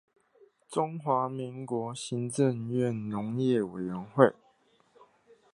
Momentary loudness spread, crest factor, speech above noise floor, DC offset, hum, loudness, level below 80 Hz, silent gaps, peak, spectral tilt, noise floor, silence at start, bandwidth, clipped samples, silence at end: 10 LU; 26 dB; 37 dB; under 0.1%; none; -30 LUFS; -72 dBFS; none; -4 dBFS; -6.5 dB/octave; -66 dBFS; 0.7 s; 11.5 kHz; under 0.1%; 1.2 s